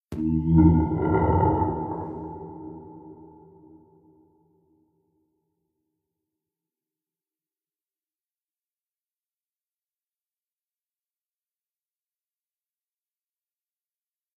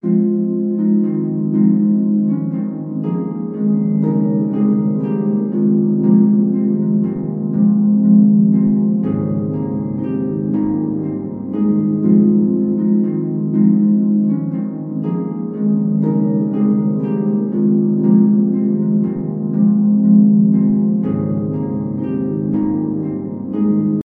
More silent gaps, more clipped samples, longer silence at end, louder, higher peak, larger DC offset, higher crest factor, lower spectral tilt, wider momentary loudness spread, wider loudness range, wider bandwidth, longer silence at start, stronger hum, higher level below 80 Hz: neither; neither; first, 11.2 s vs 0.05 s; second, -22 LUFS vs -16 LUFS; second, -6 dBFS vs -2 dBFS; neither; first, 24 dB vs 14 dB; second, -12 dB/octave vs -14.5 dB/octave; first, 23 LU vs 9 LU; first, 23 LU vs 4 LU; first, 3.1 kHz vs 2.2 kHz; about the same, 0.1 s vs 0.05 s; neither; first, -42 dBFS vs -54 dBFS